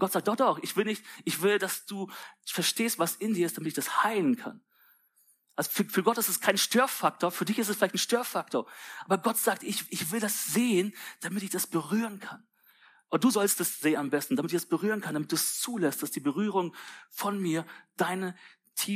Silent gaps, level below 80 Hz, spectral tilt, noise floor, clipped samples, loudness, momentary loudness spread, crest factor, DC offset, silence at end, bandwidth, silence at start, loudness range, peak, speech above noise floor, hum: none; -86 dBFS; -3.5 dB/octave; -67 dBFS; under 0.1%; -29 LUFS; 10 LU; 20 dB; under 0.1%; 0 s; 15.5 kHz; 0 s; 3 LU; -10 dBFS; 38 dB; none